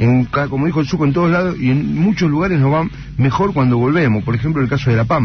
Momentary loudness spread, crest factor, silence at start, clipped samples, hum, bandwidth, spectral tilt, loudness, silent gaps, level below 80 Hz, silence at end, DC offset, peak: 4 LU; 10 dB; 0 s; under 0.1%; none; 6.6 kHz; -8.5 dB/octave; -16 LUFS; none; -38 dBFS; 0 s; under 0.1%; -6 dBFS